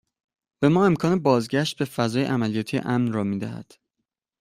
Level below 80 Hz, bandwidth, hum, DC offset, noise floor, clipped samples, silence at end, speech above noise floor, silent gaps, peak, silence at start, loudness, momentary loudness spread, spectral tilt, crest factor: -60 dBFS; 15.5 kHz; none; under 0.1%; -82 dBFS; under 0.1%; 0.8 s; 60 dB; none; -6 dBFS; 0.6 s; -23 LUFS; 8 LU; -6.5 dB/octave; 18 dB